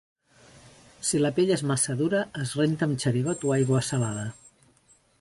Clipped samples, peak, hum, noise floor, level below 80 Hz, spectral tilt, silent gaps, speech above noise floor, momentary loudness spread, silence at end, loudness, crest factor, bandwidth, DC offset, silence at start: under 0.1%; -12 dBFS; none; -62 dBFS; -62 dBFS; -5 dB/octave; none; 37 dB; 7 LU; 0.9 s; -26 LUFS; 16 dB; 11.5 kHz; under 0.1%; 0.65 s